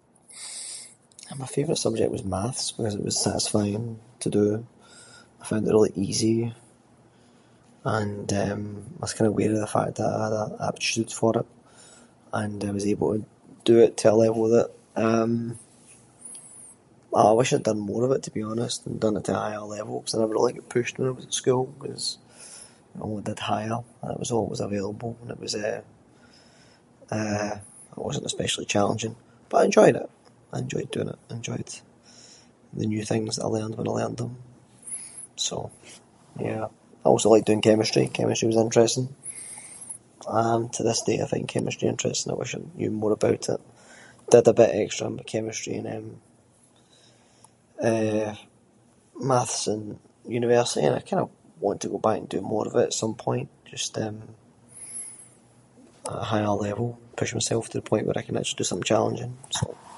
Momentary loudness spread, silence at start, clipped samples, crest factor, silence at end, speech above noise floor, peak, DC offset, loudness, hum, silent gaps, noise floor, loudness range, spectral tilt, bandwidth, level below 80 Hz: 17 LU; 0.3 s; under 0.1%; 24 dB; 0 s; 34 dB; -2 dBFS; under 0.1%; -25 LUFS; none; none; -59 dBFS; 9 LU; -5 dB/octave; 11.5 kHz; -58 dBFS